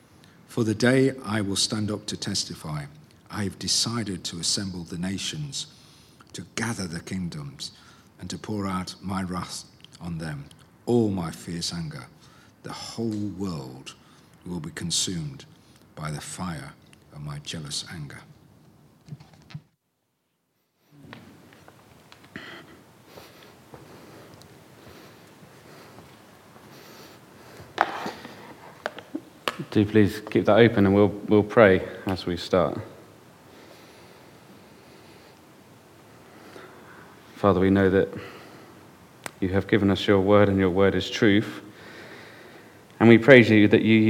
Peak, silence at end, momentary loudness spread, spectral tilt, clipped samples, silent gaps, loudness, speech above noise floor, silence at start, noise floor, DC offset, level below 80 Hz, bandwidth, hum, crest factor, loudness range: 0 dBFS; 0 s; 26 LU; -5 dB/octave; under 0.1%; none; -24 LUFS; 52 dB; 0.5 s; -75 dBFS; under 0.1%; -60 dBFS; 16.5 kHz; none; 26 dB; 20 LU